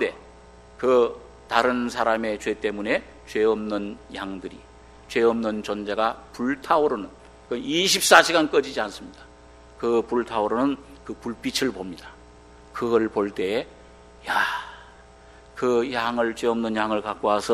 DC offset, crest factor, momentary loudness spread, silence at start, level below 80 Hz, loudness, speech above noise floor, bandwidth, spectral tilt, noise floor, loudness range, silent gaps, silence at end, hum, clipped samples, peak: under 0.1%; 24 dB; 15 LU; 0 s; -52 dBFS; -24 LUFS; 25 dB; 13 kHz; -3 dB/octave; -49 dBFS; 6 LU; none; 0 s; none; under 0.1%; 0 dBFS